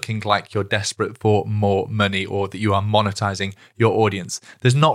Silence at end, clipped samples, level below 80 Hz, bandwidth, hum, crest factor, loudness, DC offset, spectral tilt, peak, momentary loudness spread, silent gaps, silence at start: 0 s; under 0.1%; -62 dBFS; 12.5 kHz; none; 18 dB; -21 LUFS; under 0.1%; -5.5 dB/octave; -2 dBFS; 7 LU; none; 0 s